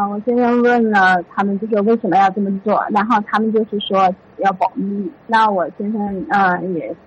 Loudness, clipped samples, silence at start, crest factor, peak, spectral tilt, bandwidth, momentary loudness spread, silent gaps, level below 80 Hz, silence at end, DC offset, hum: -16 LUFS; under 0.1%; 0 s; 12 dB; -4 dBFS; -7 dB/octave; 9 kHz; 8 LU; none; -58 dBFS; 0.1 s; under 0.1%; none